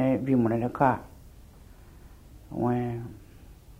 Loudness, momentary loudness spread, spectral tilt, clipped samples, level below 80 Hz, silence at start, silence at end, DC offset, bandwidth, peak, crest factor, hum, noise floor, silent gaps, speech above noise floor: -27 LUFS; 16 LU; -9 dB/octave; under 0.1%; -52 dBFS; 0 s; 0.05 s; under 0.1%; 15.5 kHz; -8 dBFS; 22 dB; none; -50 dBFS; none; 24 dB